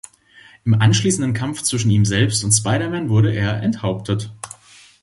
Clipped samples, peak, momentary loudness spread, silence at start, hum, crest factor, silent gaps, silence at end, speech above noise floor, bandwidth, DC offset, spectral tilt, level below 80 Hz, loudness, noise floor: under 0.1%; -2 dBFS; 9 LU; 0.65 s; none; 16 dB; none; 0.5 s; 31 dB; 11.5 kHz; under 0.1%; -4.5 dB/octave; -44 dBFS; -18 LUFS; -48 dBFS